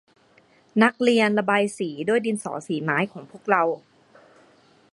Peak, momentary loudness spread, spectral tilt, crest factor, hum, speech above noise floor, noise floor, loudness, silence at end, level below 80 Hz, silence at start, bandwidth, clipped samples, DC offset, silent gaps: -2 dBFS; 10 LU; -5 dB/octave; 22 dB; none; 36 dB; -58 dBFS; -23 LUFS; 1.15 s; -74 dBFS; 0.75 s; 11.5 kHz; under 0.1%; under 0.1%; none